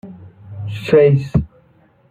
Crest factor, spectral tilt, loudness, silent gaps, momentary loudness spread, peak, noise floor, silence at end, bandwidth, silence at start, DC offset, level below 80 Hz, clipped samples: 16 dB; -8.5 dB/octave; -15 LUFS; none; 22 LU; -2 dBFS; -53 dBFS; 0.65 s; 8.4 kHz; 0.05 s; under 0.1%; -38 dBFS; under 0.1%